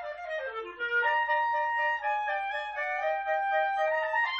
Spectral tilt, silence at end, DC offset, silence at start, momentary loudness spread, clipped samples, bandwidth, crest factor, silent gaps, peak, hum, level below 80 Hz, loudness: -2 dB/octave; 0 s; under 0.1%; 0 s; 9 LU; under 0.1%; 8 kHz; 12 dB; none; -16 dBFS; none; -68 dBFS; -29 LUFS